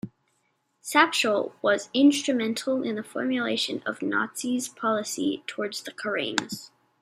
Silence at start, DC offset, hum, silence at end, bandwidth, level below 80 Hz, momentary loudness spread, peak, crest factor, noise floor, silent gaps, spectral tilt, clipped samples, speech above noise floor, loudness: 0.05 s; under 0.1%; none; 0.35 s; 15.5 kHz; -74 dBFS; 11 LU; -2 dBFS; 24 dB; -72 dBFS; none; -3 dB/octave; under 0.1%; 46 dB; -26 LUFS